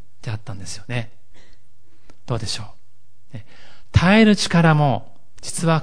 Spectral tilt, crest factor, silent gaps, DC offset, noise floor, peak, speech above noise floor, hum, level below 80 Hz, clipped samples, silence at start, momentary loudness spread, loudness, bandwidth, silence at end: -5.5 dB/octave; 20 dB; none; 4%; -61 dBFS; -2 dBFS; 43 dB; none; -42 dBFS; under 0.1%; 0.25 s; 27 LU; -19 LUFS; 10.5 kHz; 0 s